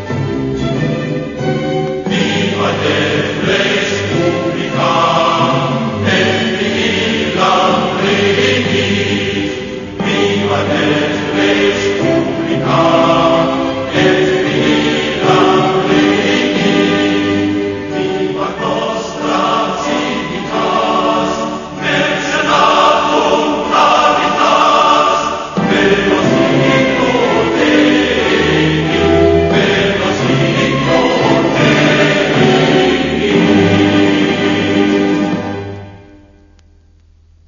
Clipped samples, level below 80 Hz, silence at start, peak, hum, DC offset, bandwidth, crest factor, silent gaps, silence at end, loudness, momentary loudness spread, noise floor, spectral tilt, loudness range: under 0.1%; -42 dBFS; 0 s; 0 dBFS; none; under 0.1%; 7.4 kHz; 12 dB; none; 1.3 s; -12 LUFS; 7 LU; -46 dBFS; -5 dB/octave; 4 LU